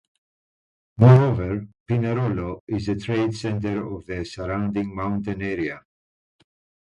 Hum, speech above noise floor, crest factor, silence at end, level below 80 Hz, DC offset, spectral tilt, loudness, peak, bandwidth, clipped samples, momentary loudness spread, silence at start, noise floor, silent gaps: none; over 69 dB; 22 dB; 1.1 s; -46 dBFS; under 0.1%; -8.5 dB/octave; -23 LUFS; 0 dBFS; 8.4 kHz; under 0.1%; 16 LU; 1 s; under -90 dBFS; 1.80-1.86 s, 2.60-2.67 s